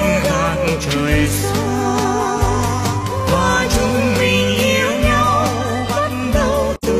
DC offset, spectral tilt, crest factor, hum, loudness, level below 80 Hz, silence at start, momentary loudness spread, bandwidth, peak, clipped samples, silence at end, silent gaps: under 0.1%; -5 dB/octave; 14 dB; none; -16 LUFS; -28 dBFS; 0 s; 4 LU; 15 kHz; -2 dBFS; under 0.1%; 0 s; none